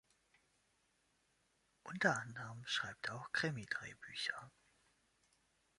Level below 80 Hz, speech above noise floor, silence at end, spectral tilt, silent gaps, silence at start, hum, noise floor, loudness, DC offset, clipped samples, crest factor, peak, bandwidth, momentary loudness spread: -80 dBFS; 37 dB; 1.3 s; -3.5 dB/octave; none; 1.85 s; none; -79 dBFS; -41 LUFS; under 0.1%; under 0.1%; 28 dB; -18 dBFS; 11.5 kHz; 13 LU